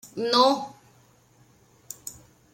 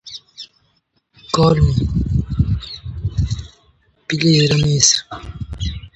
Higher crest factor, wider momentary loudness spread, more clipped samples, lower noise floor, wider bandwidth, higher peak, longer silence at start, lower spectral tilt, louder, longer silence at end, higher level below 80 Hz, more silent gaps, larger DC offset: about the same, 22 dB vs 18 dB; about the same, 21 LU vs 21 LU; neither; second, -59 dBFS vs -64 dBFS; first, 16.5 kHz vs 8.8 kHz; second, -6 dBFS vs 0 dBFS; about the same, 0.05 s vs 0.05 s; second, -3 dB/octave vs -4.5 dB/octave; second, -22 LUFS vs -17 LUFS; first, 0.4 s vs 0.1 s; second, -70 dBFS vs -28 dBFS; neither; neither